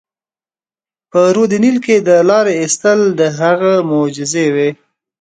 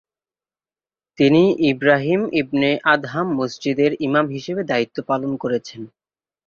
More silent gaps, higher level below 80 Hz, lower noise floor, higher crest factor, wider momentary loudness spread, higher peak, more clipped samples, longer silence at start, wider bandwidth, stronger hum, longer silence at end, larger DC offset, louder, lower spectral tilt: neither; about the same, -62 dBFS vs -60 dBFS; about the same, under -90 dBFS vs under -90 dBFS; second, 12 dB vs 18 dB; second, 6 LU vs 9 LU; about the same, 0 dBFS vs -2 dBFS; neither; about the same, 1.15 s vs 1.2 s; first, 9.4 kHz vs 7.2 kHz; neither; about the same, 0.5 s vs 0.6 s; neither; first, -12 LUFS vs -19 LUFS; second, -5 dB/octave vs -6.5 dB/octave